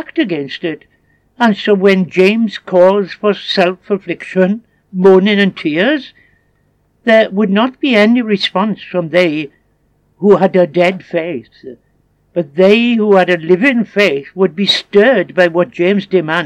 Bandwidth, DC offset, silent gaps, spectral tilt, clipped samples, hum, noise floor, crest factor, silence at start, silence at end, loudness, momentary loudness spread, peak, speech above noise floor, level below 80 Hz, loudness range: 9.6 kHz; under 0.1%; none; -6.5 dB/octave; 0.1%; 50 Hz at -55 dBFS; -57 dBFS; 12 dB; 0 s; 0 s; -12 LUFS; 10 LU; 0 dBFS; 45 dB; -60 dBFS; 3 LU